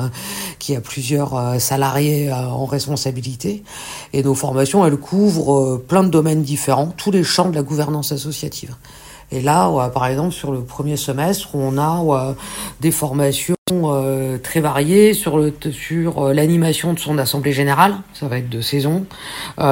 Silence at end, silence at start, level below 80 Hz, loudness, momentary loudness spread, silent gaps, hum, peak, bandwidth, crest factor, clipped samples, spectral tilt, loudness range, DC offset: 0 s; 0 s; -46 dBFS; -18 LUFS; 11 LU; 13.58-13.66 s; none; 0 dBFS; 16.5 kHz; 18 dB; under 0.1%; -5.5 dB/octave; 4 LU; under 0.1%